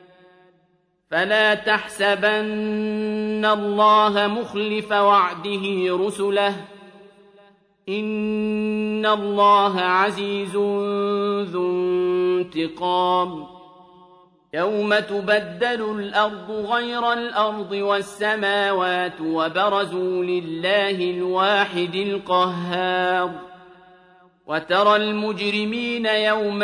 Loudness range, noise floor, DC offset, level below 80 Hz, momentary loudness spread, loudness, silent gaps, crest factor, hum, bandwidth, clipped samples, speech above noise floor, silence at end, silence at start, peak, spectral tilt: 4 LU; -65 dBFS; under 0.1%; -64 dBFS; 8 LU; -21 LUFS; none; 18 dB; none; 11 kHz; under 0.1%; 44 dB; 0 s; 1.1 s; -4 dBFS; -5 dB/octave